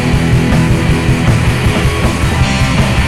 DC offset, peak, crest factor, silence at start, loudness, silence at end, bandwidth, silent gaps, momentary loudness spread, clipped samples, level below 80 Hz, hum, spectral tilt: 3%; 0 dBFS; 10 dB; 0 s; -12 LUFS; 0 s; 15.5 kHz; none; 2 LU; under 0.1%; -18 dBFS; none; -6 dB/octave